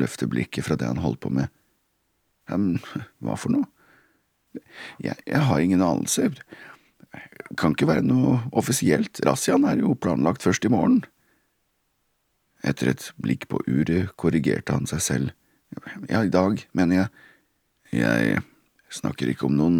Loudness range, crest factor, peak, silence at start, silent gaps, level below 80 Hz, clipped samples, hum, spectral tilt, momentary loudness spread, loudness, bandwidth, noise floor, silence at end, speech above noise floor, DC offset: 7 LU; 22 dB; -2 dBFS; 0 s; none; -52 dBFS; under 0.1%; none; -5.5 dB/octave; 16 LU; -24 LUFS; 16.5 kHz; -72 dBFS; 0 s; 49 dB; under 0.1%